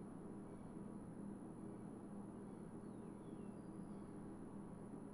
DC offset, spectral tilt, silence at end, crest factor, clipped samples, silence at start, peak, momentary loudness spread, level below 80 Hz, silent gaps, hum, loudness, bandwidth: under 0.1%; -8 dB/octave; 0 s; 12 dB; under 0.1%; 0 s; -40 dBFS; 1 LU; -70 dBFS; none; none; -54 LUFS; 11 kHz